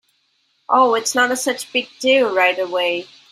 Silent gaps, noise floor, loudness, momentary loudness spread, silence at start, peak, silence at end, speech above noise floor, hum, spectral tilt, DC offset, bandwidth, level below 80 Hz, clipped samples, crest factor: none; -64 dBFS; -17 LUFS; 7 LU; 0.7 s; -2 dBFS; 0.25 s; 47 dB; none; -1 dB/octave; under 0.1%; 16 kHz; -70 dBFS; under 0.1%; 16 dB